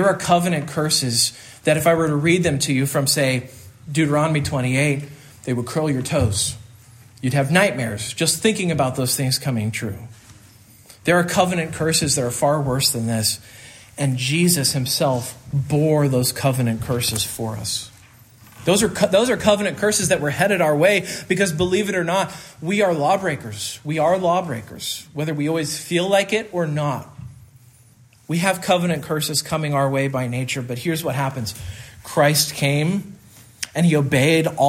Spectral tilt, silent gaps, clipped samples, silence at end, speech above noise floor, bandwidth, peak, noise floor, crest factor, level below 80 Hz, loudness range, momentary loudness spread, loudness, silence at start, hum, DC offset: -4.5 dB/octave; none; under 0.1%; 0 s; 31 dB; 16 kHz; -2 dBFS; -51 dBFS; 18 dB; -52 dBFS; 4 LU; 11 LU; -20 LUFS; 0 s; none; under 0.1%